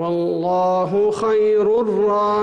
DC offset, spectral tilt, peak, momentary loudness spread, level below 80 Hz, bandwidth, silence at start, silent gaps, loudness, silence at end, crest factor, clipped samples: under 0.1%; -7 dB/octave; -10 dBFS; 4 LU; -56 dBFS; 9.2 kHz; 0 s; none; -18 LUFS; 0 s; 6 dB; under 0.1%